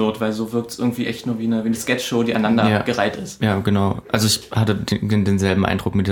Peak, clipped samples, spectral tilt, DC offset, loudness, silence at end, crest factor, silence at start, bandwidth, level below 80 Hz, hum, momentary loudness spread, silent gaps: -2 dBFS; under 0.1%; -5.5 dB/octave; under 0.1%; -20 LUFS; 0 s; 18 dB; 0 s; 18.5 kHz; -48 dBFS; none; 6 LU; none